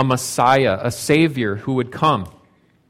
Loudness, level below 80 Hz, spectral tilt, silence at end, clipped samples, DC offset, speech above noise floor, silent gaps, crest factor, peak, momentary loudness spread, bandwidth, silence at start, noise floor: -18 LUFS; -52 dBFS; -5 dB/octave; 0.6 s; under 0.1%; under 0.1%; 38 dB; none; 16 dB; -2 dBFS; 8 LU; 16.5 kHz; 0 s; -56 dBFS